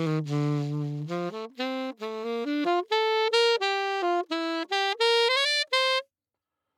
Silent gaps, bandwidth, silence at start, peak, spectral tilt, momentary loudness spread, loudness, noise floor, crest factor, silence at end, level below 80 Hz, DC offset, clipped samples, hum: none; 15.5 kHz; 0 s; -10 dBFS; -4.5 dB/octave; 10 LU; -26 LUFS; -88 dBFS; 16 dB; 0.75 s; under -90 dBFS; under 0.1%; under 0.1%; none